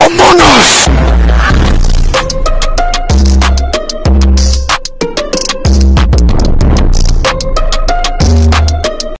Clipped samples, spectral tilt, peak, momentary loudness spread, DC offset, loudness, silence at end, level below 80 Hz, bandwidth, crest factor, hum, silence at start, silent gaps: 0.7%; -4.5 dB/octave; 0 dBFS; 10 LU; under 0.1%; -9 LUFS; 0 s; -10 dBFS; 8 kHz; 6 dB; none; 0 s; none